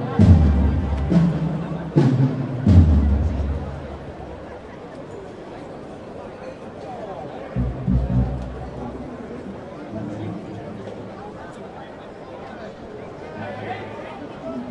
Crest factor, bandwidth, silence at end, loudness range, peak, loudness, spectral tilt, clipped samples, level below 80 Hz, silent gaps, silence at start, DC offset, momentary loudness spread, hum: 22 dB; 7.8 kHz; 0 s; 16 LU; 0 dBFS; -22 LUFS; -9.5 dB/octave; under 0.1%; -30 dBFS; none; 0 s; under 0.1%; 20 LU; none